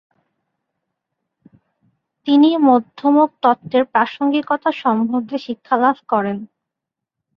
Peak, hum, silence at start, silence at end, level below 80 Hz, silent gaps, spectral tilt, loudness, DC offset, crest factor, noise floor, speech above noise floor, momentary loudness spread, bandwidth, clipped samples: -2 dBFS; none; 2.25 s; 0.95 s; -68 dBFS; none; -7.5 dB/octave; -17 LUFS; under 0.1%; 18 dB; -83 dBFS; 67 dB; 11 LU; 5.8 kHz; under 0.1%